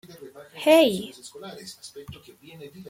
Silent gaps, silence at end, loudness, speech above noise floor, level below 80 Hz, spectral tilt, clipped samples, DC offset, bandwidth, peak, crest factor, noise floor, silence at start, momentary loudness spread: none; 0.1 s; -20 LUFS; 20 dB; -64 dBFS; -4 dB/octave; under 0.1%; under 0.1%; 16.5 kHz; -4 dBFS; 22 dB; -45 dBFS; 0.2 s; 27 LU